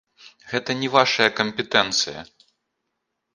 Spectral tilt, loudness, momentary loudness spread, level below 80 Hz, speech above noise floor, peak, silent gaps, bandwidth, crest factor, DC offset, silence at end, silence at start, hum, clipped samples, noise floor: -2.5 dB/octave; -21 LUFS; 10 LU; -64 dBFS; 57 dB; 0 dBFS; none; 11.5 kHz; 24 dB; under 0.1%; 1.1 s; 0.25 s; none; under 0.1%; -78 dBFS